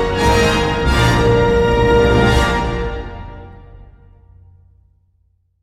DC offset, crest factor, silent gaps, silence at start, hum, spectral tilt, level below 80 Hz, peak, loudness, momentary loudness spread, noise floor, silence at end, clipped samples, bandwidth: under 0.1%; 16 dB; none; 0 s; none; -5.5 dB/octave; -24 dBFS; -2 dBFS; -14 LUFS; 15 LU; -59 dBFS; 1.8 s; under 0.1%; 15.5 kHz